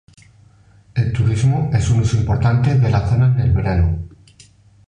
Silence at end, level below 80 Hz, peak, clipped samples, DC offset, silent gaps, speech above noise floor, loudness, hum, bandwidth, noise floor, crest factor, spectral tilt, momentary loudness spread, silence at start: 0.8 s; -28 dBFS; -4 dBFS; under 0.1%; under 0.1%; none; 34 dB; -17 LUFS; none; 9.8 kHz; -49 dBFS; 14 dB; -7.5 dB/octave; 6 LU; 0.95 s